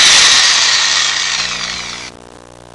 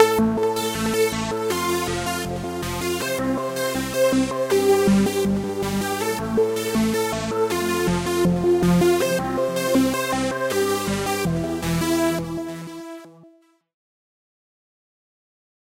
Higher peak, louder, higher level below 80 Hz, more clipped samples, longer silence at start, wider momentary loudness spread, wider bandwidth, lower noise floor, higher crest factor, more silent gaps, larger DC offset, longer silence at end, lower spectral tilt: about the same, 0 dBFS vs -2 dBFS; first, -9 LUFS vs -22 LUFS; about the same, -46 dBFS vs -44 dBFS; neither; about the same, 0 s vs 0 s; first, 19 LU vs 8 LU; second, 12 kHz vs 16 kHz; second, -37 dBFS vs -54 dBFS; second, 12 dB vs 20 dB; neither; neither; second, 0.65 s vs 2.55 s; second, 2 dB/octave vs -5 dB/octave